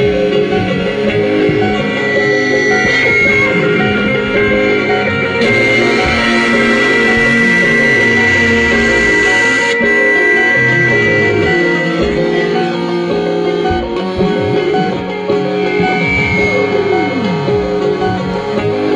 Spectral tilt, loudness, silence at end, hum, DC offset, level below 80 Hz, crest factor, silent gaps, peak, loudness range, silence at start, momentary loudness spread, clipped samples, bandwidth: -5.5 dB/octave; -11 LUFS; 0 s; none; under 0.1%; -34 dBFS; 10 dB; none; -2 dBFS; 5 LU; 0 s; 6 LU; under 0.1%; 10.5 kHz